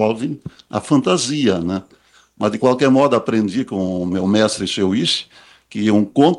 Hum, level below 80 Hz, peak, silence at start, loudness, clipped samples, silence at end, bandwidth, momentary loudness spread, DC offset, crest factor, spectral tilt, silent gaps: none; -56 dBFS; -2 dBFS; 0 s; -18 LUFS; under 0.1%; 0 s; 11.5 kHz; 12 LU; under 0.1%; 16 dB; -5 dB/octave; none